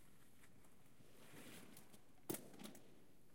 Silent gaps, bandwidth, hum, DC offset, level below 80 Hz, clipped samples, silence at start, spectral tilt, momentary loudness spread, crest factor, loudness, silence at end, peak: none; 16 kHz; none; under 0.1%; -82 dBFS; under 0.1%; 0 s; -3.5 dB/octave; 18 LU; 30 dB; -56 LUFS; 0 s; -30 dBFS